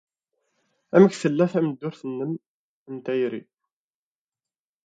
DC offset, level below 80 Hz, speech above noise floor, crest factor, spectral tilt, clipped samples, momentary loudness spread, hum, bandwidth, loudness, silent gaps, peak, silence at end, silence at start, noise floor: under 0.1%; -72 dBFS; over 68 dB; 24 dB; -7.5 dB/octave; under 0.1%; 18 LU; none; 9.2 kHz; -23 LUFS; 2.46-2.86 s; -2 dBFS; 1.45 s; 0.95 s; under -90 dBFS